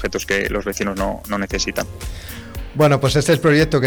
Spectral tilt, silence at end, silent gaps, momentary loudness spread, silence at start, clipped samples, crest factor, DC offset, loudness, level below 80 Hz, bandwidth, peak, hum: -5 dB/octave; 0 s; none; 17 LU; 0 s; under 0.1%; 12 dB; under 0.1%; -18 LUFS; -34 dBFS; over 20 kHz; -6 dBFS; none